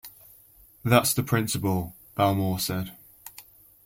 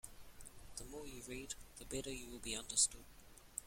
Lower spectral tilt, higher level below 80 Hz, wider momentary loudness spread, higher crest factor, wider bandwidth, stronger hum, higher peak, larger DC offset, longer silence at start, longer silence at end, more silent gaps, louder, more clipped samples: first, -5 dB/octave vs -1.5 dB/octave; about the same, -56 dBFS vs -60 dBFS; about the same, 23 LU vs 24 LU; about the same, 22 dB vs 26 dB; about the same, 16.5 kHz vs 16.5 kHz; neither; first, -6 dBFS vs -20 dBFS; neither; about the same, 0.05 s vs 0.05 s; first, 0.45 s vs 0 s; neither; first, -25 LUFS vs -42 LUFS; neither